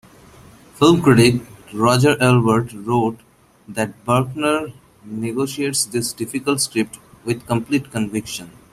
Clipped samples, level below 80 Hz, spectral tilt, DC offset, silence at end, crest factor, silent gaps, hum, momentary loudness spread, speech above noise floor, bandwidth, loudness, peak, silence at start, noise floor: under 0.1%; -50 dBFS; -5 dB/octave; under 0.1%; 0.25 s; 18 dB; none; none; 14 LU; 27 dB; 15 kHz; -18 LUFS; 0 dBFS; 0.75 s; -45 dBFS